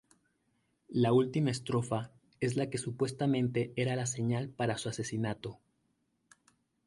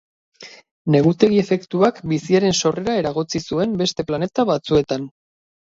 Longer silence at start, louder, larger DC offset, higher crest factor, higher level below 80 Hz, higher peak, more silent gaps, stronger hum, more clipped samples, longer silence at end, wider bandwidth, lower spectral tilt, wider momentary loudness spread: first, 0.9 s vs 0.4 s; second, -33 LUFS vs -19 LUFS; neither; about the same, 18 dB vs 20 dB; second, -68 dBFS vs -52 dBFS; second, -16 dBFS vs 0 dBFS; second, none vs 0.71-0.85 s; neither; neither; first, 1.3 s vs 0.7 s; first, 11.5 kHz vs 7.8 kHz; about the same, -6 dB/octave vs -5.5 dB/octave; about the same, 9 LU vs 8 LU